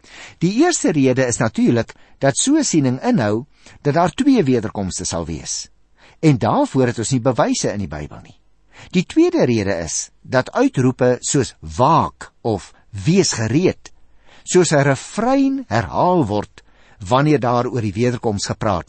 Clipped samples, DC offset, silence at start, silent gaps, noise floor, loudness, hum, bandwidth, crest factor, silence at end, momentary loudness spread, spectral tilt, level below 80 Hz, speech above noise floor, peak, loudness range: under 0.1%; 0.2%; 0.15 s; none; -46 dBFS; -18 LUFS; none; 8.8 kHz; 16 dB; 0.05 s; 10 LU; -5 dB/octave; -46 dBFS; 29 dB; -2 dBFS; 2 LU